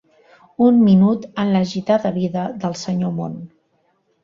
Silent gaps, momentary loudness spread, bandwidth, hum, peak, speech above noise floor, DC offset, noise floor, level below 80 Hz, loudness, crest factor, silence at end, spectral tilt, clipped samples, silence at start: none; 14 LU; 7.4 kHz; none; -4 dBFS; 47 dB; under 0.1%; -64 dBFS; -58 dBFS; -18 LUFS; 16 dB; 0.8 s; -7.5 dB/octave; under 0.1%; 0.6 s